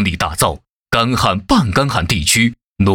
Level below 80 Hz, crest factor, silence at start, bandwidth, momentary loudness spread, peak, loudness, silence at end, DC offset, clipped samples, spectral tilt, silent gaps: -32 dBFS; 14 dB; 0 s; 19.5 kHz; 5 LU; -2 dBFS; -15 LUFS; 0 s; under 0.1%; under 0.1%; -4 dB/octave; 0.70-0.86 s, 2.64-2.76 s